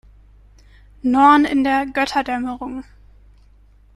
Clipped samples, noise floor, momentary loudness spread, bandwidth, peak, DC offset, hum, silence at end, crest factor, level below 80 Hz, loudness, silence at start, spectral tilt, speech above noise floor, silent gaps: under 0.1%; -50 dBFS; 17 LU; 12 kHz; -2 dBFS; under 0.1%; 50 Hz at -45 dBFS; 1.15 s; 18 dB; -46 dBFS; -17 LUFS; 1.05 s; -4.5 dB/octave; 33 dB; none